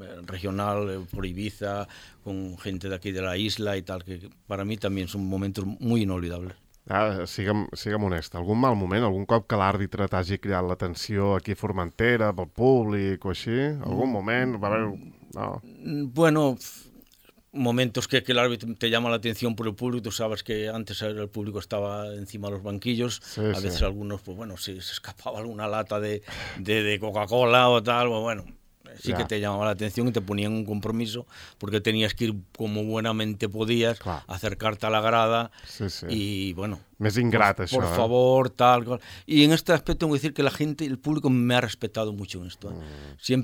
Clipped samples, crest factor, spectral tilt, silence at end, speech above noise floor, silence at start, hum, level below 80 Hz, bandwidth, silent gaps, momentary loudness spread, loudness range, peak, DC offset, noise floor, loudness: under 0.1%; 24 dB; -5.5 dB/octave; 0 s; 32 dB; 0 s; none; -48 dBFS; 17.5 kHz; none; 14 LU; 8 LU; -2 dBFS; under 0.1%; -58 dBFS; -26 LUFS